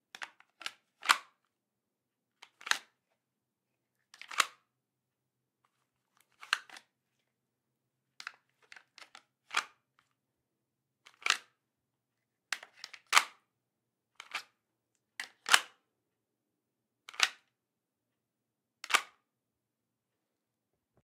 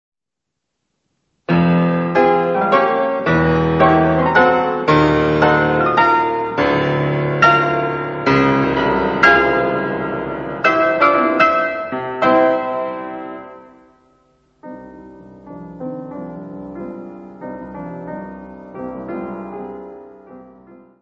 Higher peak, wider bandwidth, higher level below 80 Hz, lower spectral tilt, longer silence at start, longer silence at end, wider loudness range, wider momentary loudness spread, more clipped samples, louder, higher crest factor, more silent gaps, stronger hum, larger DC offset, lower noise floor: second, -4 dBFS vs 0 dBFS; first, 16 kHz vs 7.4 kHz; second, under -90 dBFS vs -42 dBFS; second, 3 dB/octave vs -7.5 dB/octave; second, 0.2 s vs 1.5 s; first, 2 s vs 0.25 s; second, 10 LU vs 18 LU; first, 24 LU vs 19 LU; neither; second, -32 LUFS vs -15 LUFS; first, 36 dB vs 18 dB; neither; neither; neither; first, -88 dBFS vs -81 dBFS